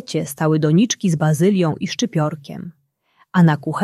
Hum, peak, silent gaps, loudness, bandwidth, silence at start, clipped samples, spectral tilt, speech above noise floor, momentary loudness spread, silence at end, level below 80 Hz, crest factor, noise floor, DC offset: none; -2 dBFS; none; -18 LUFS; 13 kHz; 0.1 s; under 0.1%; -6 dB/octave; 42 dB; 15 LU; 0 s; -60 dBFS; 16 dB; -60 dBFS; under 0.1%